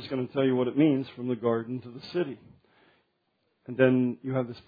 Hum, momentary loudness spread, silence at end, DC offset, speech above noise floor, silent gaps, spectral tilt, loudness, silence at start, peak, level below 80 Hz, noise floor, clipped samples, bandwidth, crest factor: none; 13 LU; 0.1 s; under 0.1%; 48 dB; none; -9.5 dB/octave; -28 LUFS; 0 s; -8 dBFS; -72 dBFS; -75 dBFS; under 0.1%; 5 kHz; 20 dB